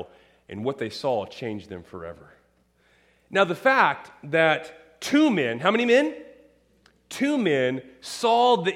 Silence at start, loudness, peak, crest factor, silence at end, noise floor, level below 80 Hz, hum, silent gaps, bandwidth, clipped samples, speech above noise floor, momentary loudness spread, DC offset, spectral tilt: 0 s; -23 LUFS; -4 dBFS; 20 dB; 0 s; -64 dBFS; -66 dBFS; none; none; 15 kHz; under 0.1%; 41 dB; 20 LU; under 0.1%; -5 dB/octave